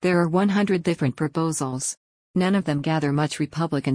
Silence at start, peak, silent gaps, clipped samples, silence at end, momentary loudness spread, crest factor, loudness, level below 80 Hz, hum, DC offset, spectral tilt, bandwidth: 0 s; -10 dBFS; 1.97-2.34 s; under 0.1%; 0 s; 7 LU; 14 dB; -23 LUFS; -58 dBFS; none; under 0.1%; -5.5 dB/octave; 10.5 kHz